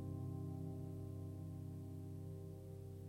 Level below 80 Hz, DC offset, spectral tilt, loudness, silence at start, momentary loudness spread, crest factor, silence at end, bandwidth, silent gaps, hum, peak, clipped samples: -70 dBFS; under 0.1%; -9 dB/octave; -50 LUFS; 0 s; 5 LU; 12 dB; 0 s; 16 kHz; none; none; -36 dBFS; under 0.1%